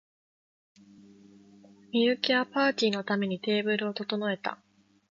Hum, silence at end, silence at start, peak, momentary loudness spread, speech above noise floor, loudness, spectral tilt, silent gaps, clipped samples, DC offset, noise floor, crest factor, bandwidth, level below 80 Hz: none; 0.55 s; 1.95 s; -10 dBFS; 7 LU; 27 dB; -28 LUFS; -5 dB/octave; none; under 0.1%; under 0.1%; -55 dBFS; 20 dB; 7.6 kHz; -80 dBFS